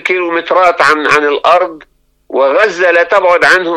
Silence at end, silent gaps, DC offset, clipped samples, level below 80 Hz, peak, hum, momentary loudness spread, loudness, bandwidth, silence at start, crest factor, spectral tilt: 0 s; none; under 0.1%; 0.2%; -52 dBFS; 0 dBFS; none; 6 LU; -9 LUFS; 12 kHz; 0.05 s; 10 dB; -3 dB/octave